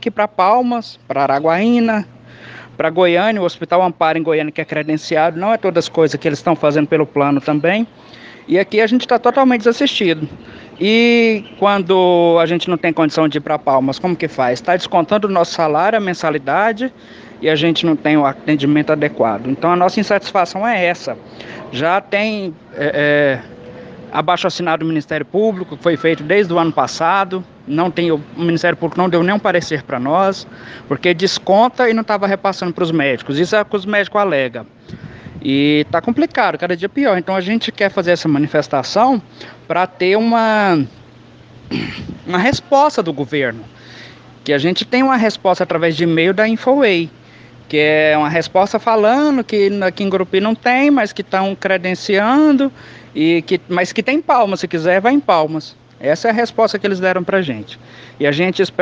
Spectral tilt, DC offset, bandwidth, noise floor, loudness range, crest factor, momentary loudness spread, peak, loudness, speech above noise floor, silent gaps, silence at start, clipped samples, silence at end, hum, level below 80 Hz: -6 dB/octave; under 0.1%; 8 kHz; -42 dBFS; 3 LU; 16 dB; 10 LU; 0 dBFS; -15 LUFS; 27 dB; none; 0 s; under 0.1%; 0 s; none; -56 dBFS